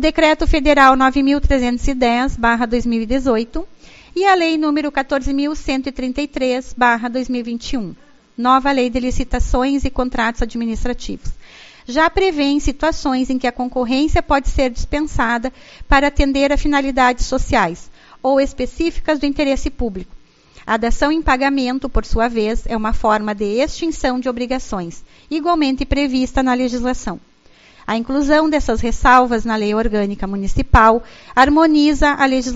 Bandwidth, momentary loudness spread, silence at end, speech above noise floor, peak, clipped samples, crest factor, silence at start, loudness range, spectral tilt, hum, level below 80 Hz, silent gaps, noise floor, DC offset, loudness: 8 kHz; 10 LU; 0 s; 31 dB; 0 dBFS; under 0.1%; 16 dB; 0 s; 5 LU; -3.5 dB/octave; none; -26 dBFS; none; -47 dBFS; under 0.1%; -17 LUFS